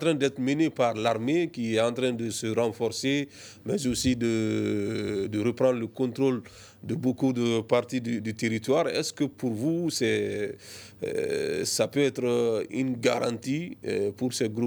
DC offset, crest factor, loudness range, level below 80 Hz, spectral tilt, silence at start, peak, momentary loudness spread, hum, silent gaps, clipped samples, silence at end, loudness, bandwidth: under 0.1%; 18 dB; 1 LU; -60 dBFS; -5 dB/octave; 0 s; -8 dBFS; 7 LU; none; none; under 0.1%; 0 s; -28 LUFS; over 20 kHz